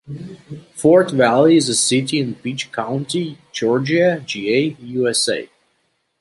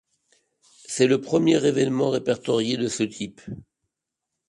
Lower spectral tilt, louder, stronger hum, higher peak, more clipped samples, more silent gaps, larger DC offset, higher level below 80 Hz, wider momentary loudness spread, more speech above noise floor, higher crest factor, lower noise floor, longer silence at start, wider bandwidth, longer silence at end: about the same, -4 dB/octave vs -5 dB/octave; first, -17 LUFS vs -23 LUFS; neither; first, -2 dBFS vs -6 dBFS; neither; neither; neither; about the same, -62 dBFS vs -62 dBFS; about the same, 14 LU vs 15 LU; second, 49 dB vs 61 dB; about the same, 16 dB vs 18 dB; second, -67 dBFS vs -84 dBFS; second, 0.1 s vs 0.9 s; about the same, 11.5 kHz vs 11.5 kHz; about the same, 0.75 s vs 0.85 s